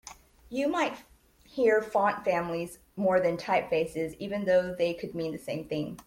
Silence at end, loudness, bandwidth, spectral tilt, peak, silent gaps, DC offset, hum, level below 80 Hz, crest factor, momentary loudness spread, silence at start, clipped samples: 0.05 s; -29 LUFS; 16.5 kHz; -5.5 dB/octave; -12 dBFS; none; under 0.1%; none; -62 dBFS; 18 dB; 11 LU; 0.05 s; under 0.1%